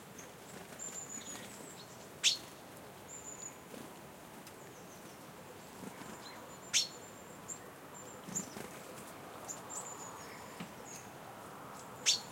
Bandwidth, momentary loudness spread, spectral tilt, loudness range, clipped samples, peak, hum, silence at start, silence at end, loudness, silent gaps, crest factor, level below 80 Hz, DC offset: 16.5 kHz; 19 LU; -1 dB/octave; 10 LU; under 0.1%; -16 dBFS; none; 0 s; 0 s; -41 LUFS; none; 28 dB; -76 dBFS; under 0.1%